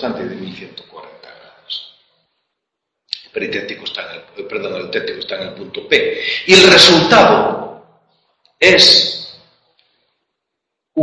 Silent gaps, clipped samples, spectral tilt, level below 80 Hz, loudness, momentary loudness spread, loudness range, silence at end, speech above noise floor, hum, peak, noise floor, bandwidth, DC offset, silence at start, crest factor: none; 0.3%; -3 dB/octave; -50 dBFS; -10 LUFS; 24 LU; 19 LU; 0 s; 65 dB; none; 0 dBFS; -78 dBFS; 11 kHz; under 0.1%; 0 s; 16 dB